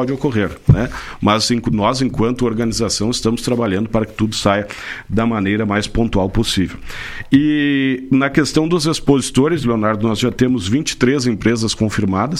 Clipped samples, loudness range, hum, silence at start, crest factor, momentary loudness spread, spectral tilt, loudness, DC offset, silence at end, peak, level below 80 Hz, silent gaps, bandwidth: under 0.1%; 2 LU; none; 0 s; 16 dB; 4 LU; -5.5 dB/octave; -17 LUFS; under 0.1%; 0 s; 0 dBFS; -34 dBFS; none; 14.5 kHz